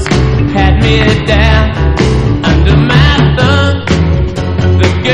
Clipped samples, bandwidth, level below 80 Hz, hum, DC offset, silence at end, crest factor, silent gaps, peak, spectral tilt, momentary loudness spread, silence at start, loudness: 0.8%; 9.8 kHz; -14 dBFS; none; 2%; 0 s; 8 dB; none; 0 dBFS; -6.5 dB/octave; 4 LU; 0 s; -9 LUFS